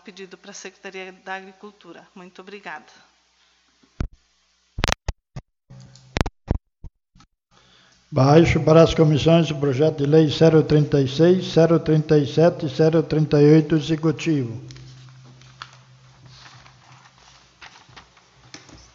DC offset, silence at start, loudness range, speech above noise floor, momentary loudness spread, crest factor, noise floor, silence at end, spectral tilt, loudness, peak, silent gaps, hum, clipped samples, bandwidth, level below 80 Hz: under 0.1%; 0.05 s; 21 LU; 46 dB; 23 LU; 22 dB; -64 dBFS; 1.3 s; -7 dB/octave; -18 LUFS; 0 dBFS; none; none; under 0.1%; 7.6 kHz; -40 dBFS